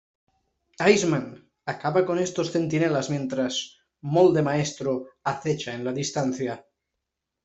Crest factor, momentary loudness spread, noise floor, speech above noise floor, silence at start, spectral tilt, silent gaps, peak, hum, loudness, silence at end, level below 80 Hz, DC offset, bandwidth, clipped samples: 22 dB; 13 LU; -83 dBFS; 59 dB; 0.8 s; -5 dB/octave; none; -4 dBFS; none; -25 LUFS; 0.85 s; -64 dBFS; under 0.1%; 8.2 kHz; under 0.1%